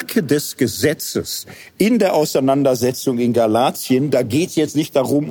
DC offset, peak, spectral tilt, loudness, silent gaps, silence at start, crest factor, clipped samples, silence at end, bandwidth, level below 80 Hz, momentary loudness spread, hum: under 0.1%; -2 dBFS; -5 dB/octave; -17 LUFS; none; 0 s; 14 dB; under 0.1%; 0 s; 19.5 kHz; -58 dBFS; 7 LU; none